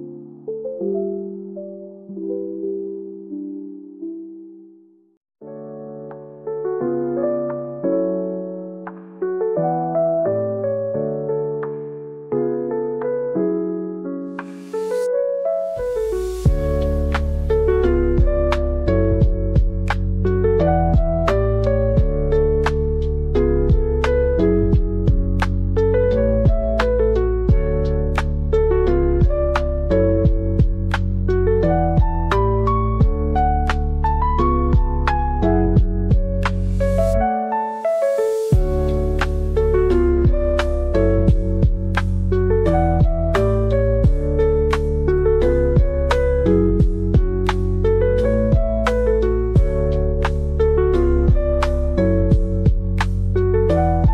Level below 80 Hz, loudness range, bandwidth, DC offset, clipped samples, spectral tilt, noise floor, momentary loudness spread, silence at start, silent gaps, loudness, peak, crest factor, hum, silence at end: -22 dBFS; 7 LU; 9.6 kHz; 0.1%; under 0.1%; -8.5 dB/octave; -50 dBFS; 11 LU; 0 s; 5.17-5.21 s; -19 LUFS; -6 dBFS; 12 dB; none; 0 s